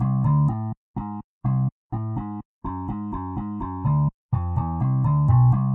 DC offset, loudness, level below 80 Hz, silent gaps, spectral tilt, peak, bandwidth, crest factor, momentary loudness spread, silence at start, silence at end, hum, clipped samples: under 0.1%; -24 LUFS; -42 dBFS; 0.77-0.94 s, 1.24-1.41 s, 1.72-1.90 s, 2.45-2.61 s, 4.14-4.29 s; -12.5 dB/octave; -10 dBFS; 2.6 kHz; 14 dB; 14 LU; 0 s; 0 s; none; under 0.1%